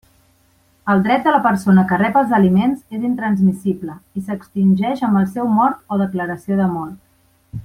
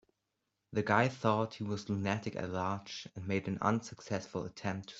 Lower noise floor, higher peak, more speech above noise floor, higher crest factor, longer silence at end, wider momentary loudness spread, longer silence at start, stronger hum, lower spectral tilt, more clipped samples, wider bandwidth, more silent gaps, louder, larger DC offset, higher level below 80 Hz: second, -57 dBFS vs -85 dBFS; first, -2 dBFS vs -12 dBFS; second, 40 dB vs 50 dB; second, 16 dB vs 24 dB; about the same, 0.05 s vs 0 s; first, 13 LU vs 10 LU; first, 0.85 s vs 0.7 s; neither; first, -8 dB/octave vs -6 dB/octave; neither; first, 11.5 kHz vs 8 kHz; neither; first, -17 LUFS vs -35 LUFS; neither; first, -52 dBFS vs -70 dBFS